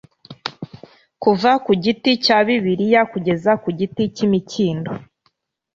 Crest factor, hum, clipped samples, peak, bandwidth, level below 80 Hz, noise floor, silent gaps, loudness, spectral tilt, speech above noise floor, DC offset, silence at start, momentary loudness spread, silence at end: 16 dB; none; under 0.1%; -2 dBFS; 7.6 kHz; -58 dBFS; -66 dBFS; none; -18 LUFS; -6 dB/octave; 49 dB; under 0.1%; 0.3 s; 15 LU; 0.75 s